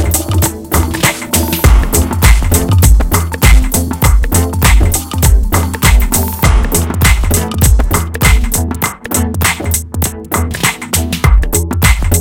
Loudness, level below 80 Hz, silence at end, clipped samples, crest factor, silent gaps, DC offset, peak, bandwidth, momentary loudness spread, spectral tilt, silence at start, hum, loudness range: -11 LUFS; -12 dBFS; 0 s; 0.8%; 10 dB; none; under 0.1%; 0 dBFS; 17.5 kHz; 6 LU; -4 dB/octave; 0 s; none; 3 LU